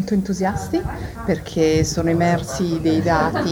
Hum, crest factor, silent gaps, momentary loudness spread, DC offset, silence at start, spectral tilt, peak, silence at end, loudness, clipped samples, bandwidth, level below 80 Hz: none; 16 dB; none; 7 LU; under 0.1%; 0 s; -6 dB/octave; -4 dBFS; 0 s; -20 LUFS; under 0.1%; 19.5 kHz; -36 dBFS